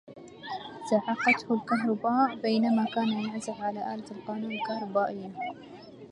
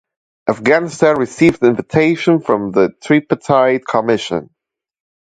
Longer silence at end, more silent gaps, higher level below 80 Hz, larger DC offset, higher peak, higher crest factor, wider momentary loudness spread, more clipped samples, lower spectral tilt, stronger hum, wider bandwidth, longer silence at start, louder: second, 0 s vs 0.9 s; neither; second, -74 dBFS vs -52 dBFS; neither; second, -10 dBFS vs 0 dBFS; first, 20 dB vs 14 dB; first, 14 LU vs 5 LU; neither; about the same, -5.5 dB/octave vs -6 dB/octave; neither; first, 10.5 kHz vs 9.2 kHz; second, 0.05 s vs 0.45 s; second, -29 LUFS vs -15 LUFS